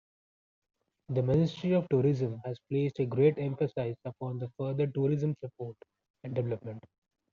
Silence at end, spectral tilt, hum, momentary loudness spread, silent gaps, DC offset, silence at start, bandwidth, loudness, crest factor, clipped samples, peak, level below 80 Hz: 0.55 s; -8.5 dB/octave; none; 14 LU; 6.10-6.14 s; under 0.1%; 1.1 s; 7 kHz; -31 LUFS; 18 dB; under 0.1%; -14 dBFS; -66 dBFS